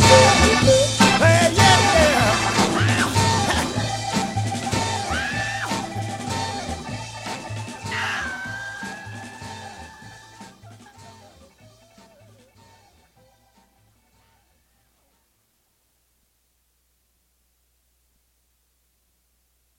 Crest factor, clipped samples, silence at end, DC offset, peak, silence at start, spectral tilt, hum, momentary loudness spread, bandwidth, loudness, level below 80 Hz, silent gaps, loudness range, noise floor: 22 dB; under 0.1%; 8.65 s; under 0.1%; 0 dBFS; 0 s; -4 dB/octave; none; 22 LU; 16 kHz; -19 LUFS; -40 dBFS; none; 22 LU; -67 dBFS